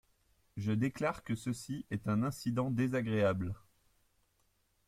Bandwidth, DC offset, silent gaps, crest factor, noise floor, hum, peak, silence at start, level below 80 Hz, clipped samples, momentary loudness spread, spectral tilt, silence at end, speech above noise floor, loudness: 15.5 kHz; under 0.1%; none; 18 dB; -75 dBFS; none; -20 dBFS; 0.55 s; -64 dBFS; under 0.1%; 9 LU; -7 dB/octave; 1.3 s; 41 dB; -35 LUFS